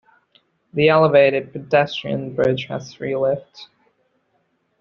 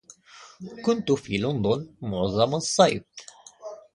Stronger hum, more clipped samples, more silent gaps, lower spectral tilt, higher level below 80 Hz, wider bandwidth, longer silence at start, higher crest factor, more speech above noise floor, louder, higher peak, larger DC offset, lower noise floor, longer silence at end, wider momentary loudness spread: neither; neither; neither; about the same, -4.5 dB/octave vs -5 dB/octave; about the same, -58 dBFS vs -54 dBFS; second, 6.8 kHz vs 11.5 kHz; first, 0.75 s vs 0.35 s; about the same, 18 dB vs 22 dB; first, 48 dB vs 25 dB; first, -19 LUFS vs -25 LUFS; about the same, -2 dBFS vs -4 dBFS; neither; first, -67 dBFS vs -50 dBFS; first, 1.15 s vs 0.2 s; second, 14 LU vs 22 LU